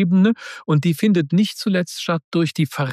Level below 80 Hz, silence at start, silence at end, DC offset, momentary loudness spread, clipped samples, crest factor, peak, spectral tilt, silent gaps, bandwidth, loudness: -68 dBFS; 0 s; 0 s; under 0.1%; 6 LU; under 0.1%; 12 dB; -6 dBFS; -6.5 dB/octave; 2.24-2.32 s; 14.5 kHz; -19 LUFS